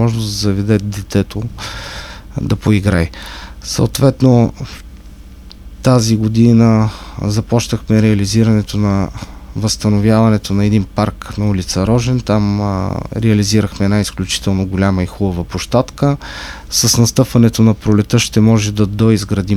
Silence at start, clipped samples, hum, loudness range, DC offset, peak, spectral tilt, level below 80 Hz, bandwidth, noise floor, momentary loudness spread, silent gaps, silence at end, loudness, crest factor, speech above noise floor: 0 s; under 0.1%; none; 4 LU; under 0.1%; 0 dBFS; -6 dB/octave; -32 dBFS; 14.5 kHz; -35 dBFS; 12 LU; none; 0 s; -14 LUFS; 14 dB; 21 dB